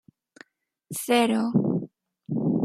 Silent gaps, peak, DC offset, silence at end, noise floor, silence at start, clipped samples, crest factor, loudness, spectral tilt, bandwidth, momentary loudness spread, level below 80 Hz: none; -8 dBFS; under 0.1%; 0 s; -57 dBFS; 0.9 s; under 0.1%; 18 dB; -25 LUFS; -5.5 dB/octave; 16 kHz; 13 LU; -70 dBFS